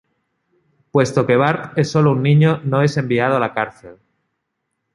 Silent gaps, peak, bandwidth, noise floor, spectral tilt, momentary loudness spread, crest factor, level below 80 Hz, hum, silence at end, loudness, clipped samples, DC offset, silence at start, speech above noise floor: none; -2 dBFS; 11 kHz; -75 dBFS; -7 dB/octave; 7 LU; 16 dB; -56 dBFS; none; 1 s; -17 LUFS; under 0.1%; under 0.1%; 0.95 s; 59 dB